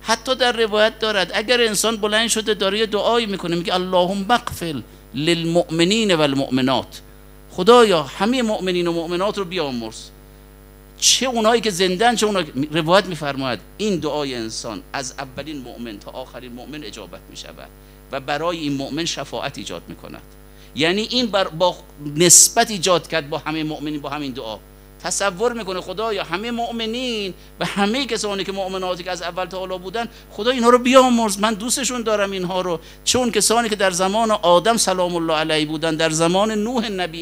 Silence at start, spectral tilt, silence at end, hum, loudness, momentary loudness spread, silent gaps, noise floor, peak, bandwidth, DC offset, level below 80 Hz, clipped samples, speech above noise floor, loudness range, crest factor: 0 s; -3 dB/octave; 0 s; none; -19 LUFS; 17 LU; none; -43 dBFS; 0 dBFS; 16 kHz; under 0.1%; -46 dBFS; under 0.1%; 24 dB; 11 LU; 20 dB